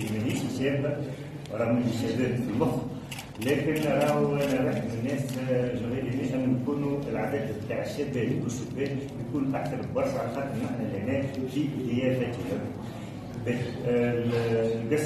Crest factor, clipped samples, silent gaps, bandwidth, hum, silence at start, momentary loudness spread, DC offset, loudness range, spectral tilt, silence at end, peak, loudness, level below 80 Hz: 16 dB; under 0.1%; none; 13.5 kHz; none; 0 s; 7 LU; under 0.1%; 3 LU; -7 dB/octave; 0 s; -12 dBFS; -29 LUFS; -54 dBFS